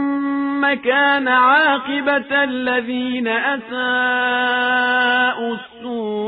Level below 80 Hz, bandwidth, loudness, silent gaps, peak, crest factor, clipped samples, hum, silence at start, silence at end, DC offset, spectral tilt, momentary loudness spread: -64 dBFS; 5 kHz; -17 LUFS; none; -4 dBFS; 14 dB; under 0.1%; none; 0 s; 0 s; under 0.1%; -6.5 dB/octave; 9 LU